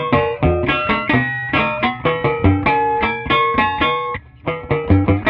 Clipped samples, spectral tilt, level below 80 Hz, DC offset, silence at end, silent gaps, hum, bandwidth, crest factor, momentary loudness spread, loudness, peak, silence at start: under 0.1%; -9 dB/octave; -34 dBFS; under 0.1%; 0 s; none; none; 5.4 kHz; 16 dB; 6 LU; -17 LUFS; -2 dBFS; 0 s